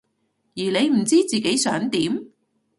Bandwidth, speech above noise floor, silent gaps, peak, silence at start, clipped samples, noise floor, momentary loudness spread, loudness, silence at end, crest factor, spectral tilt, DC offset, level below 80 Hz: 12 kHz; 50 dB; none; -6 dBFS; 0.55 s; under 0.1%; -70 dBFS; 10 LU; -21 LUFS; 0.5 s; 16 dB; -3.5 dB/octave; under 0.1%; -64 dBFS